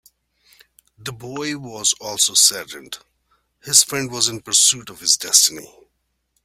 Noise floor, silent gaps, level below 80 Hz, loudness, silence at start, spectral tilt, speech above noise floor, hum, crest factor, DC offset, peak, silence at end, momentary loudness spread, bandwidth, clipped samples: -71 dBFS; none; -62 dBFS; -16 LUFS; 1 s; 0 dB/octave; 51 dB; none; 22 dB; under 0.1%; 0 dBFS; 0.8 s; 21 LU; 16.5 kHz; under 0.1%